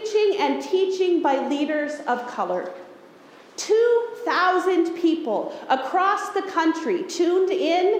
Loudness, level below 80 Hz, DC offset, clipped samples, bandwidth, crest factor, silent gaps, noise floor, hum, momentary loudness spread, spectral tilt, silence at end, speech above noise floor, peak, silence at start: -22 LUFS; -76 dBFS; under 0.1%; under 0.1%; 14.5 kHz; 14 dB; none; -48 dBFS; none; 7 LU; -3.5 dB/octave; 0 s; 26 dB; -8 dBFS; 0 s